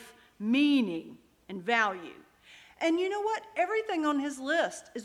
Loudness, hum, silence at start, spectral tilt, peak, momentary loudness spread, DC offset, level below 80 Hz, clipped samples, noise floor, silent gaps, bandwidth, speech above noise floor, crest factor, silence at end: -29 LUFS; none; 0 s; -4 dB/octave; -12 dBFS; 13 LU; under 0.1%; -74 dBFS; under 0.1%; -56 dBFS; none; 12.5 kHz; 27 dB; 20 dB; 0 s